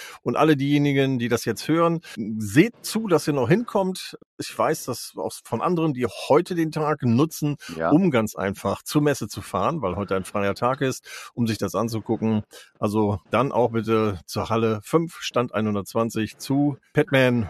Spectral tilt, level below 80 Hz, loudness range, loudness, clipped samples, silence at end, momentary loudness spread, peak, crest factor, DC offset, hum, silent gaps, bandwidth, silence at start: -6 dB/octave; -58 dBFS; 3 LU; -23 LUFS; under 0.1%; 0 s; 9 LU; -2 dBFS; 20 dB; under 0.1%; none; 4.26-4.37 s; 13.5 kHz; 0 s